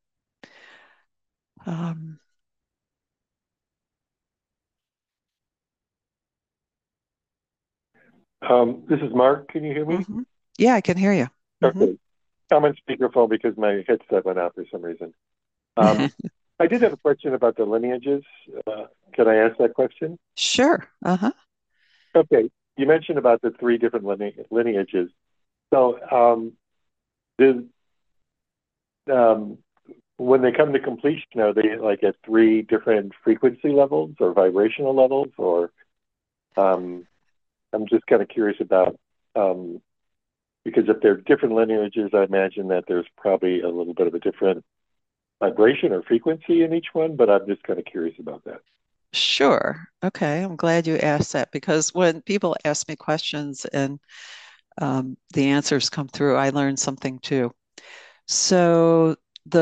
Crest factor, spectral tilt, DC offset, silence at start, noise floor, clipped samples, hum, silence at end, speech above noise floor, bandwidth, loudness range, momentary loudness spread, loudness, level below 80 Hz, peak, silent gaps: 20 dB; -5 dB/octave; under 0.1%; 1.65 s; -90 dBFS; under 0.1%; none; 0 s; 69 dB; 9.2 kHz; 4 LU; 14 LU; -21 LUFS; -66 dBFS; -2 dBFS; none